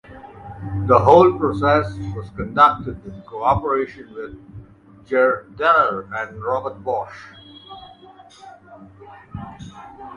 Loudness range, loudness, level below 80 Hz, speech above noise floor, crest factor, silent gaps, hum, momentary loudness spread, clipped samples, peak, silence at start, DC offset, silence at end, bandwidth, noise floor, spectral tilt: 13 LU; -18 LUFS; -44 dBFS; 27 dB; 20 dB; none; none; 24 LU; under 0.1%; 0 dBFS; 0.1 s; under 0.1%; 0 s; 10 kHz; -46 dBFS; -7.5 dB/octave